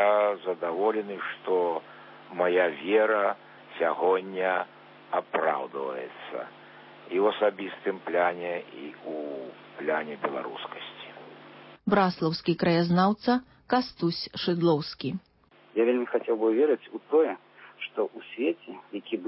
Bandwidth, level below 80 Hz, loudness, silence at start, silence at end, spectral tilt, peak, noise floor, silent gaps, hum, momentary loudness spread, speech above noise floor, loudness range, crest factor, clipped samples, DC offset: 5.8 kHz; -70 dBFS; -28 LUFS; 0 s; 0 s; -10 dB/octave; -10 dBFS; -49 dBFS; none; none; 16 LU; 22 dB; 5 LU; 18 dB; under 0.1%; under 0.1%